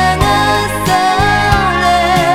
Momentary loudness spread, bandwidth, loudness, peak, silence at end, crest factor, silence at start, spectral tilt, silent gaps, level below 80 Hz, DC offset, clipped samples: 2 LU; 18 kHz; -11 LUFS; 0 dBFS; 0 s; 12 dB; 0 s; -4.5 dB/octave; none; -24 dBFS; under 0.1%; under 0.1%